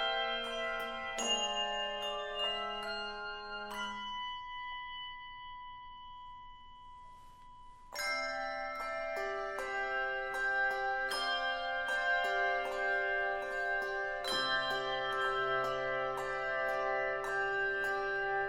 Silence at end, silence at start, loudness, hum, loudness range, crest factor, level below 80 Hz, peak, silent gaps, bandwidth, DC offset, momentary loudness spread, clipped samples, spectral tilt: 0 s; 0 s; -35 LUFS; none; 10 LU; 16 dB; -60 dBFS; -22 dBFS; none; 16 kHz; under 0.1%; 15 LU; under 0.1%; -1.5 dB/octave